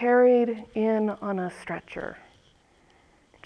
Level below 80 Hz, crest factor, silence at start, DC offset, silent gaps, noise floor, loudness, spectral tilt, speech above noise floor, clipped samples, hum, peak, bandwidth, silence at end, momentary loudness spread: -64 dBFS; 16 dB; 0 s; under 0.1%; none; -61 dBFS; -26 LUFS; -7.5 dB/octave; 36 dB; under 0.1%; none; -10 dBFS; 9.6 kHz; 1.25 s; 18 LU